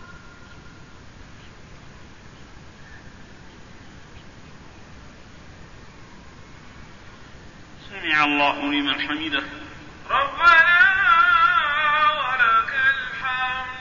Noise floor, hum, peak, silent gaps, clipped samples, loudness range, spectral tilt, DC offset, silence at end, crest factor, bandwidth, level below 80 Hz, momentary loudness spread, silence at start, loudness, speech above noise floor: -44 dBFS; none; -4 dBFS; none; under 0.1%; 9 LU; -3.5 dB/octave; 0.3%; 0 s; 20 dB; 7.4 kHz; -50 dBFS; 13 LU; 0 s; -18 LUFS; 21 dB